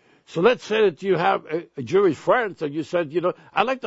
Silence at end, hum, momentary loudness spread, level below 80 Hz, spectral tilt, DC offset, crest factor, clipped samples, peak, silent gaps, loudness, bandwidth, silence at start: 0 s; none; 9 LU; -64 dBFS; -6 dB/octave; under 0.1%; 20 dB; under 0.1%; -2 dBFS; none; -22 LUFS; 8 kHz; 0.3 s